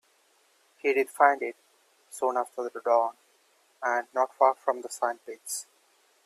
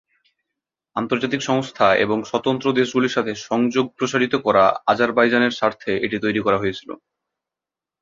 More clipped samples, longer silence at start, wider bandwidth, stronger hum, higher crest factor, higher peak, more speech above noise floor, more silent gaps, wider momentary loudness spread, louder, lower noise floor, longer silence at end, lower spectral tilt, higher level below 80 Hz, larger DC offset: neither; about the same, 0.85 s vs 0.95 s; first, 15.5 kHz vs 7.6 kHz; neither; about the same, 24 dB vs 20 dB; second, -6 dBFS vs -2 dBFS; second, 39 dB vs 69 dB; neither; first, 12 LU vs 7 LU; second, -28 LUFS vs -20 LUFS; second, -66 dBFS vs -88 dBFS; second, 0.65 s vs 1.05 s; second, -1 dB/octave vs -5 dB/octave; second, -86 dBFS vs -58 dBFS; neither